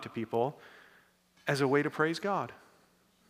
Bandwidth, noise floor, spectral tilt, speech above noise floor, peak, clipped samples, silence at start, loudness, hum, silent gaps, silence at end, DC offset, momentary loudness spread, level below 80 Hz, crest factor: 15.5 kHz; -67 dBFS; -6 dB/octave; 35 dB; -14 dBFS; under 0.1%; 0 s; -32 LUFS; none; none; 0.75 s; under 0.1%; 12 LU; -80 dBFS; 20 dB